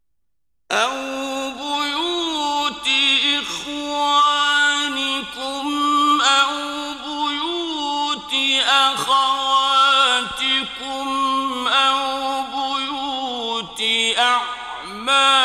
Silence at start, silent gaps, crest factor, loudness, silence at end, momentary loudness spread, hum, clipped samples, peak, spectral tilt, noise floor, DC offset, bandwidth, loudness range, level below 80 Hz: 0.7 s; none; 18 dB; -18 LUFS; 0 s; 11 LU; none; under 0.1%; -2 dBFS; -0.5 dB/octave; -78 dBFS; under 0.1%; 15 kHz; 4 LU; -58 dBFS